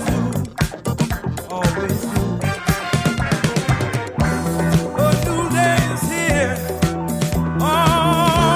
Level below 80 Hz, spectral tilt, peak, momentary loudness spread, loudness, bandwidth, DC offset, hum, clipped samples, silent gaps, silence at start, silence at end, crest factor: -32 dBFS; -5.5 dB/octave; -2 dBFS; 7 LU; -19 LUFS; 16 kHz; under 0.1%; none; under 0.1%; none; 0 s; 0 s; 16 dB